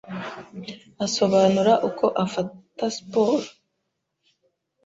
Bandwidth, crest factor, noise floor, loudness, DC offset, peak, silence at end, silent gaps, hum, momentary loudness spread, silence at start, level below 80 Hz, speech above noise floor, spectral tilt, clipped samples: 8 kHz; 18 dB; -78 dBFS; -22 LUFS; under 0.1%; -6 dBFS; 1.35 s; none; none; 19 LU; 0.05 s; -66 dBFS; 55 dB; -5 dB/octave; under 0.1%